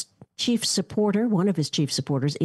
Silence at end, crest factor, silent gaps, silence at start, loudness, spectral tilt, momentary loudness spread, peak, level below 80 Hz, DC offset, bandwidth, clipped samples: 0 s; 12 dB; none; 0 s; -24 LUFS; -5 dB/octave; 4 LU; -12 dBFS; -64 dBFS; under 0.1%; 12.5 kHz; under 0.1%